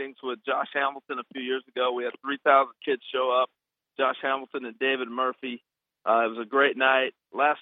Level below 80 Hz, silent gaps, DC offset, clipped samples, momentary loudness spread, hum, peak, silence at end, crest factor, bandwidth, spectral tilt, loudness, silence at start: under -90 dBFS; none; under 0.1%; under 0.1%; 13 LU; none; -6 dBFS; 0 s; 22 dB; 4 kHz; -6.5 dB/octave; -26 LUFS; 0 s